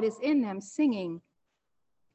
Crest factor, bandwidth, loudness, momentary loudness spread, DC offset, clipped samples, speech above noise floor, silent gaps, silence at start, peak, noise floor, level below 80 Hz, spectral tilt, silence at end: 14 dB; 8.6 kHz; -30 LUFS; 11 LU; under 0.1%; under 0.1%; 52 dB; none; 0 s; -18 dBFS; -81 dBFS; -78 dBFS; -6 dB/octave; 0.95 s